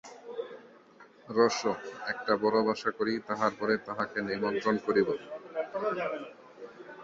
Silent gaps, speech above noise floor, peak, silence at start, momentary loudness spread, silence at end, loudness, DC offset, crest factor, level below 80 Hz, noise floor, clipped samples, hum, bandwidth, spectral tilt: none; 26 dB; -10 dBFS; 0.05 s; 17 LU; 0 s; -31 LUFS; under 0.1%; 22 dB; -72 dBFS; -56 dBFS; under 0.1%; none; 7.8 kHz; -4.5 dB/octave